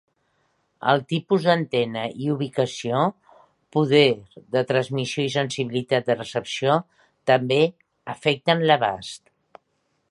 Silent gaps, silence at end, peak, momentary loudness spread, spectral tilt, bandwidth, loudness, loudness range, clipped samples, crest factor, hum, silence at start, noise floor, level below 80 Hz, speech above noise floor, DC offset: none; 0.95 s; -2 dBFS; 9 LU; -5.5 dB/octave; 11.5 kHz; -22 LUFS; 2 LU; under 0.1%; 20 dB; none; 0.8 s; -71 dBFS; -66 dBFS; 49 dB; under 0.1%